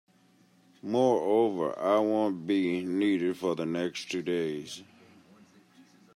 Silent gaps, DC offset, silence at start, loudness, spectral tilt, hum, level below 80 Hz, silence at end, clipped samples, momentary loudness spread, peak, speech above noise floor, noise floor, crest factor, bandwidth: none; under 0.1%; 0.85 s; -29 LUFS; -6 dB/octave; none; -80 dBFS; 1.3 s; under 0.1%; 9 LU; -12 dBFS; 35 dB; -63 dBFS; 18 dB; 13.5 kHz